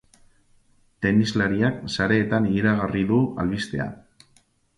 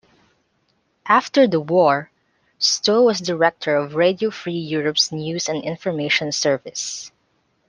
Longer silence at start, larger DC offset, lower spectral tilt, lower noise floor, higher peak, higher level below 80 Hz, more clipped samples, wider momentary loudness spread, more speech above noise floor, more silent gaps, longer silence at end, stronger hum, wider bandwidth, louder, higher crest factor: about the same, 1 s vs 1.05 s; neither; first, -6.5 dB/octave vs -3.5 dB/octave; second, -61 dBFS vs -66 dBFS; second, -6 dBFS vs -2 dBFS; first, -48 dBFS vs -66 dBFS; neither; second, 7 LU vs 11 LU; second, 40 dB vs 47 dB; neither; first, 0.85 s vs 0.6 s; neither; about the same, 11.5 kHz vs 10.5 kHz; second, -23 LUFS vs -19 LUFS; about the same, 18 dB vs 18 dB